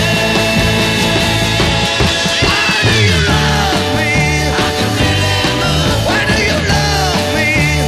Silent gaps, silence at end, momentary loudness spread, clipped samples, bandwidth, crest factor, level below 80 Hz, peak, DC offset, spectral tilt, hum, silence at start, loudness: none; 0 s; 3 LU; under 0.1%; 15.5 kHz; 12 dB; -24 dBFS; -2 dBFS; under 0.1%; -4 dB/octave; none; 0 s; -12 LUFS